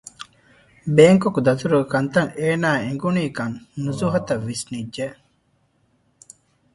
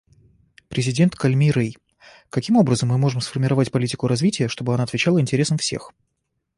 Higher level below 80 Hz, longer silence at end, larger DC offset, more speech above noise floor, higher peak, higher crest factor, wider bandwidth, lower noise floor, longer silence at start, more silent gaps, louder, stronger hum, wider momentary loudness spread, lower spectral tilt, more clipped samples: about the same, -56 dBFS vs -54 dBFS; first, 1.6 s vs 0.7 s; neither; second, 45 dB vs 56 dB; first, 0 dBFS vs -4 dBFS; about the same, 20 dB vs 16 dB; about the same, 11.5 kHz vs 11.5 kHz; second, -64 dBFS vs -75 dBFS; second, 0.2 s vs 0.7 s; neither; about the same, -20 LUFS vs -20 LUFS; neither; first, 17 LU vs 8 LU; about the same, -6 dB/octave vs -6 dB/octave; neither